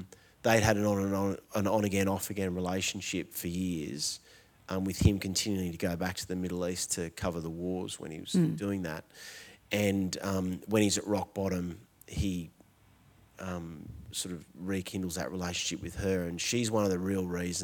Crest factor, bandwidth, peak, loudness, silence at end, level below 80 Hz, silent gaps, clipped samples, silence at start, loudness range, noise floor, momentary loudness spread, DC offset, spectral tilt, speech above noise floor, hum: 24 dB; 19 kHz; -8 dBFS; -32 LUFS; 0 s; -52 dBFS; none; under 0.1%; 0 s; 6 LU; -62 dBFS; 12 LU; under 0.1%; -4.5 dB/octave; 30 dB; none